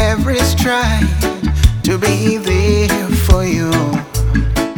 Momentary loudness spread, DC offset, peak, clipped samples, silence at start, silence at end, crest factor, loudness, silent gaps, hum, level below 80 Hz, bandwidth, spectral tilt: 4 LU; under 0.1%; 0 dBFS; under 0.1%; 0 s; 0 s; 14 dB; -14 LUFS; none; none; -18 dBFS; over 20 kHz; -5.5 dB/octave